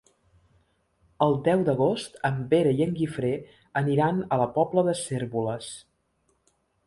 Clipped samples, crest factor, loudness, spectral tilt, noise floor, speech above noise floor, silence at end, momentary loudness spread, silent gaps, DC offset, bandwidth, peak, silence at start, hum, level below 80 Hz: under 0.1%; 18 dB; -26 LUFS; -6.5 dB/octave; -71 dBFS; 46 dB; 1.05 s; 9 LU; none; under 0.1%; 11.5 kHz; -8 dBFS; 1.2 s; none; -60 dBFS